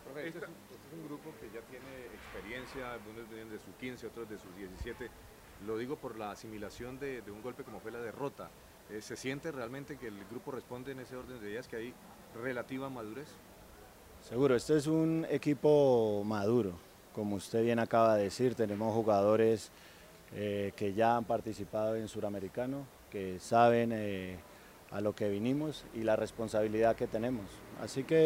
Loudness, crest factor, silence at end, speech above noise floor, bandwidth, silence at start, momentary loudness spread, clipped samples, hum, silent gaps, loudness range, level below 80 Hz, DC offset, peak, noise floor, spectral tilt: -34 LUFS; 22 dB; 0 s; 21 dB; 16 kHz; 0 s; 20 LU; under 0.1%; none; none; 14 LU; -62 dBFS; under 0.1%; -12 dBFS; -56 dBFS; -6.5 dB/octave